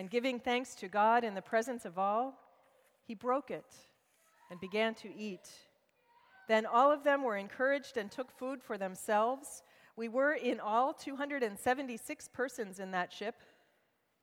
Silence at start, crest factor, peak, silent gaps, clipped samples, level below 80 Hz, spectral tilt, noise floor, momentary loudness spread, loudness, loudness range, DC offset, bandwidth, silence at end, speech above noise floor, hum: 0 s; 20 dB; -16 dBFS; none; under 0.1%; -80 dBFS; -4 dB/octave; -77 dBFS; 15 LU; -35 LUFS; 7 LU; under 0.1%; 17 kHz; 0.9 s; 42 dB; none